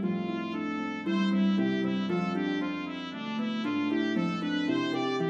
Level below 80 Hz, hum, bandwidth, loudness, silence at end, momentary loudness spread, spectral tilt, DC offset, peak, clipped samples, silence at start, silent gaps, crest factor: -76 dBFS; none; 7.8 kHz; -30 LUFS; 0 s; 7 LU; -7 dB/octave; under 0.1%; -16 dBFS; under 0.1%; 0 s; none; 14 dB